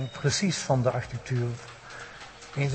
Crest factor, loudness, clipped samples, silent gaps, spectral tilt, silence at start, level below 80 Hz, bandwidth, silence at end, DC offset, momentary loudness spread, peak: 18 dB; -28 LUFS; under 0.1%; none; -5 dB/octave; 0 s; -56 dBFS; 8.8 kHz; 0 s; under 0.1%; 17 LU; -12 dBFS